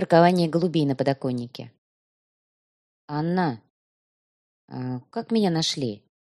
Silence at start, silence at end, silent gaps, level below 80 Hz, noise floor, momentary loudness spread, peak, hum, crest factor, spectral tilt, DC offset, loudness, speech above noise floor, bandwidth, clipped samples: 0 s; 0.25 s; 1.78-3.08 s, 3.70-4.68 s; -66 dBFS; under -90 dBFS; 19 LU; -4 dBFS; none; 22 dB; -6 dB/octave; under 0.1%; -24 LUFS; over 67 dB; 12 kHz; under 0.1%